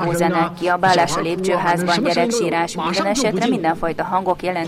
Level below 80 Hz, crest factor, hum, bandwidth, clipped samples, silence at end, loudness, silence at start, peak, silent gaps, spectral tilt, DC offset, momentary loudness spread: -48 dBFS; 14 dB; none; 16 kHz; under 0.1%; 0 s; -18 LUFS; 0 s; -4 dBFS; none; -4.5 dB/octave; under 0.1%; 5 LU